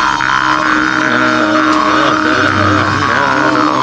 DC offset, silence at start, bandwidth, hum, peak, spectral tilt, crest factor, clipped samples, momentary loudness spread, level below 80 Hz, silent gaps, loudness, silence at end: under 0.1%; 0 s; 9.2 kHz; none; 0 dBFS; -4.5 dB/octave; 12 dB; under 0.1%; 1 LU; -40 dBFS; none; -11 LUFS; 0 s